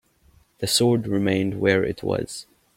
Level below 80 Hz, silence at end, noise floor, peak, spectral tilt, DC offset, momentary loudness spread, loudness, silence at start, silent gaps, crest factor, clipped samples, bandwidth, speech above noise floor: -52 dBFS; 0.35 s; -58 dBFS; -2 dBFS; -4.5 dB/octave; under 0.1%; 12 LU; -22 LUFS; 0.6 s; none; 20 dB; under 0.1%; 16.5 kHz; 36 dB